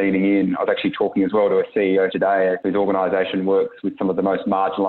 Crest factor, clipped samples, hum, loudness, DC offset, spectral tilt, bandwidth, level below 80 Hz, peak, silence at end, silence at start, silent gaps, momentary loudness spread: 12 dB; under 0.1%; none; -20 LUFS; under 0.1%; -9.5 dB/octave; 4.3 kHz; -62 dBFS; -8 dBFS; 0 s; 0 s; none; 3 LU